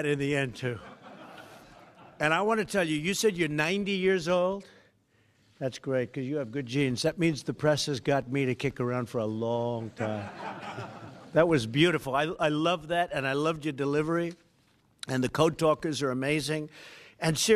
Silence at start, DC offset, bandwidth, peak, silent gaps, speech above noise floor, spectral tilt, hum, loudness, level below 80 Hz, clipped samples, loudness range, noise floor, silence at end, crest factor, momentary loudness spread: 0 s; under 0.1%; 14.5 kHz; -8 dBFS; none; 38 dB; -5 dB/octave; none; -29 LUFS; -60 dBFS; under 0.1%; 3 LU; -67 dBFS; 0 s; 22 dB; 14 LU